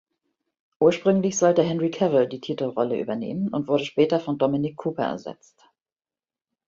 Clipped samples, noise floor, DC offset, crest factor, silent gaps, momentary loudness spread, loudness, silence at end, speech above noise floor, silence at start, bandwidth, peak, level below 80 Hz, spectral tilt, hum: under 0.1%; under -90 dBFS; under 0.1%; 20 dB; none; 9 LU; -23 LUFS; 1.35 s; over 67 dB; 0.8 s; 7.8 kHz; -6 dBFS; -66 dBFS; -5.5 dB/octave; none